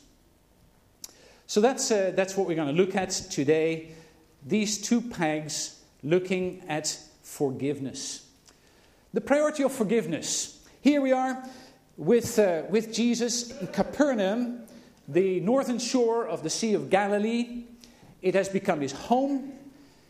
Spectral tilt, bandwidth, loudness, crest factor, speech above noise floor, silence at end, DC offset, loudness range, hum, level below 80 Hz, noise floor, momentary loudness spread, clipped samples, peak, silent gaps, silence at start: -4.5 dB/octave; 15.5 kHz; -27 LUFS; 20 dB; 35 dB; 0.4 s; under 0.1%; 4 LU; none; -64 dBFS; -61 dBFS; 12 LU; under 0.1%; -8 dBFS; none; 1.5 s